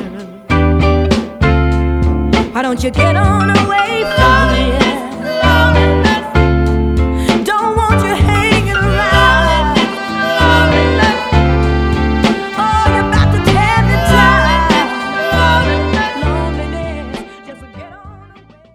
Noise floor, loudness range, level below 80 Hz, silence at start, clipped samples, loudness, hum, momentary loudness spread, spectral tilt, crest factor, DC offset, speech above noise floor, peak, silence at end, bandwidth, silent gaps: -41 dBFS; 2 LU; -18 dBFS; 0 s; under 0.1%; -12 LUFS; none; 7 LU; -6 dB/octave; 12 dB; under 0.1%; 30 dB; 0 dBFS; 0.5 s; 14 kHz; none